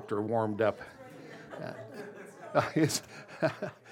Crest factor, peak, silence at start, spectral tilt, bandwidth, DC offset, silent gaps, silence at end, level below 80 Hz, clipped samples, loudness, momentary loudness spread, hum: 22 dB; -12 dBFS; 0 s; -5 dB/octave; 16.5 kHz; under 0.1%; none; 0 s; -74 dBFS; under 0.1%; -32 LUFS; 19 LU; none